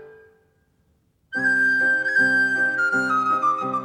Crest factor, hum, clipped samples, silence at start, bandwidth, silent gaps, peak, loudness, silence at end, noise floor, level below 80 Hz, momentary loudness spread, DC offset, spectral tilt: 12 dB; none; under 0.1%; 0 s; 11.5 kHz; none; -10 dBFS; -19 LUFS; 0 s; -65 dBFS; -72 dBFS; 4 LU; under 0.1%; -4 dB/octave